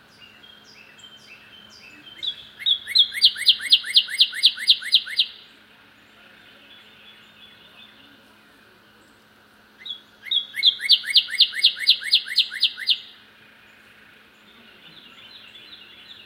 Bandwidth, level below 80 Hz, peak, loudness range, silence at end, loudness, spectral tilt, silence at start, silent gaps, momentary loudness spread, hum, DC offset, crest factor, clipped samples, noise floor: 16 kHz; -74 dBFS; -2 dBFS; 10 LU; 0.1 s; -18 LUFS; 2 dB/octave; 0.2 s; none; 15 LU; none; under 0.1%; 24 dB; under 0.1%; -54 dBFS